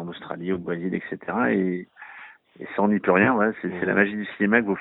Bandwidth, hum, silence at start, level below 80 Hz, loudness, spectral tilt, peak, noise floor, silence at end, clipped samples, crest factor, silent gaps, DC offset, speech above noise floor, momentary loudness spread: 4.1 kHz; none; 0 s; -62 dBFS; -23 LUFS; -11 dB/octave; -4 dBFS; -46 dBFS; 0 s; under 0.1%; 20 dB; none; under 0.1%; 23 dB; 20 LU